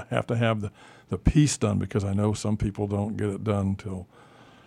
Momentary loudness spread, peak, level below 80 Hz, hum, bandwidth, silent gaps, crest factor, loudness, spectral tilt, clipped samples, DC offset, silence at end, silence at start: 12 LU; -8 dBFS; -40 dBFS; none; 12 kHz; none; 20 dB; -26 LUFS; -6 dB/octave; under 0.1%; under 0.1%; 0.65 s; 0 s